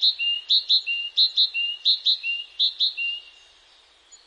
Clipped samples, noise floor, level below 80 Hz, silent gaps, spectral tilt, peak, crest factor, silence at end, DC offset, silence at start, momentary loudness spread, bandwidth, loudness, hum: under 0.1%; -56 dBFS; -74 dBFS; none; 4.5 dB/octave; -10 dBFS; 16 dB; 1 s; under 0.1%; 0 s; 9 LU; 10 kHz; -20 LUFS; none